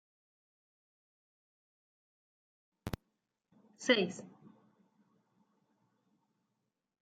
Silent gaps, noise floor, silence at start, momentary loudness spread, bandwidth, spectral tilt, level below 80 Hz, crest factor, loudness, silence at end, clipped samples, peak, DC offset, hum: none; -86 dBFS; 2.85 s; 19 LU; 8.8 kHz; -4 dB/octave; -66 dBFS; 30 dB; -34 LUFS; 2.55 s; under 0.1%; -14 dBFS; under 0.1%; none